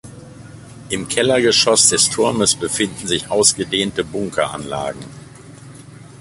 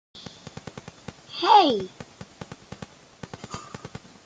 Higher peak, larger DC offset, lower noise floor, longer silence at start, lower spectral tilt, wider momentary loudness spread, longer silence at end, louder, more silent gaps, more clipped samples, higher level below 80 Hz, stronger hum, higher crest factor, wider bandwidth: first, 0 dBFS vs -4 dBFS; neither; second, -39 dBFS vs -45 dBFS; about the same, 0.05 s vs 0.15 s; second, -2 dB/octave vs -4.5 dB/octave; second, 14 LU vs 26 LU; second, 0.05 s vs 0.4 s; first, -16 LUFS vs -20 LUFS; neither; neither; first, -48 dBFS vs -62 dBFS; neither; about the same, 18 dB vs 22 dB; first, 13.5 kHz vs 9.2 kHz